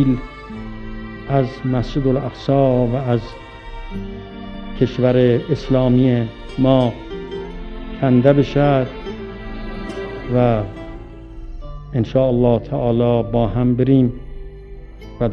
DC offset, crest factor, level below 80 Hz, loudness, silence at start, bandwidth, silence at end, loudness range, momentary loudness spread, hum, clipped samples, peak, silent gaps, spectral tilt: under 0.1%; 18 dB; -34 dBFS; -18 LUFS; 0 s; 6.6 kHz; 0 s; 3 LU; 21 LU; none; under 0.1%; 0 dBFS; none; -9.5 dB/octave